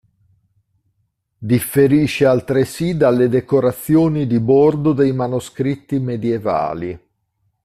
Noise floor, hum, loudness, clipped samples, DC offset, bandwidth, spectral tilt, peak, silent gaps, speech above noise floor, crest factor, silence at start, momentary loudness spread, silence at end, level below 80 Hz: -68 dBFS; none; -16 LUFS; under 0.1%; under 0.1%; 15.5 kHz; -7 dB/octave; -2 dBFS; none; 53 dB; 14 dB; 1.4 s; 9 LU; 0.65 s; -48 dBFS